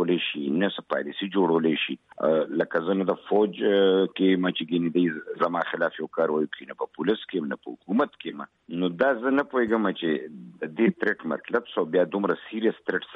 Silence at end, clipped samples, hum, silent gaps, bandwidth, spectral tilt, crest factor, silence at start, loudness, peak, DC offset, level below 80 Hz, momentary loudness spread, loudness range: 0 s; under 0.1%; none; none; 5.2 kHz; -8.5 dB/octave; 16 dB; 0 s; -26 LUFS; -8 dBFS; under 0.1%; -72 dBFS; 8 LU; 4 LU